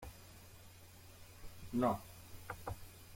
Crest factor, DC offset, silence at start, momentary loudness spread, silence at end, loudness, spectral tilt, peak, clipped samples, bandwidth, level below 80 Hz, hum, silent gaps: 22 dB; under 0.1%; 0 s; 22 LU; 0 s; -41 LUFS; -6 dB/octave; -22 dBFS; under 0.1%; 16.5 kHz; -60 dBFS; none; none